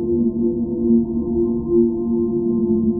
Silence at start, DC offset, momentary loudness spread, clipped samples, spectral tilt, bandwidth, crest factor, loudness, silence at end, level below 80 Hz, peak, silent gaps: 0 s; under 0.1%; 3 LU; under 0.1%; -17 dB/octave; 1.1 kHz; 12 dB; -19 LUFS; 0 s; -38 dBFS; -6 dBFS; none